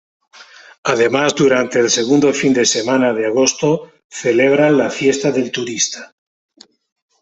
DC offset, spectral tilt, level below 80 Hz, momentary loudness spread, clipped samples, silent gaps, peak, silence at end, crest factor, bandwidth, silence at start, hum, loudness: under 0.1%; -3.5 dB/octave; -58 dBFS; 8 LU; under 0.1%; 4.04-4.10 s; 0 dBFS; 1.15 s; 16 dB; 8.4 kHz; 0.85 s; none; -15 LUFS